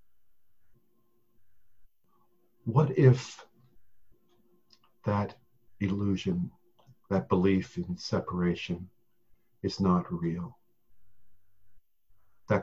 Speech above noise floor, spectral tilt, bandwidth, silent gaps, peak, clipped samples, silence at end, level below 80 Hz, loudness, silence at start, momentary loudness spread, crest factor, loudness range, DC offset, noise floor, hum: 49 dB; -7.5 dB/octave; 7.8 kHz; none; -10 dBFS; under 0.1%; 0 s; -54 dBFS; -30 LUFS; 1.8 s; 16 LU; 22 dB; 5 LU; under 0.1%; -77 dBFS; none